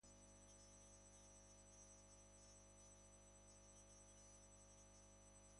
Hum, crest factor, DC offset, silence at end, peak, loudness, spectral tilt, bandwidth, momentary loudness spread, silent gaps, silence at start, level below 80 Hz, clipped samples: 50 Hz at -70 dBFS; 12 dB; under 0.1%; 0 s; -54 dBFS; -66 LUFS; -3 dB/octave; 11 kHz; 2 LU; none; 0 s; -74 dBFS; under 0.1%